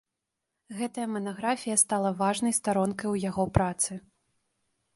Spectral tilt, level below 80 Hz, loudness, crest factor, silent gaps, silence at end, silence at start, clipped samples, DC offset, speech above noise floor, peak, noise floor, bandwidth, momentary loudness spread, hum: -4.5 dB/octave; -50 dBFS; -28 LUFS; 24 dB; none; 0.95 s; 0.7 s; under 0.1%; under 0.1%; 57 dB; -6 dBFS; -85 dBFS; 12 kHz; 10 LU; none